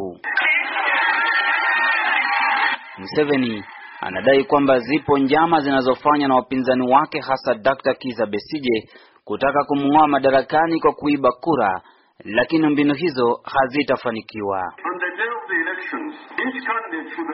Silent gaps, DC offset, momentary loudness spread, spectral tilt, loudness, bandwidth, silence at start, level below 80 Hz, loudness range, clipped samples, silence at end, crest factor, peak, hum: none; under 0.1%; 9 LU; -2.5 dB/octave; -19 LUFS; 5.8 kHz; 0 s; -56 dBFS; 4 LU; under 0.1%; 0 s; 16 dB; -2 dBFS; none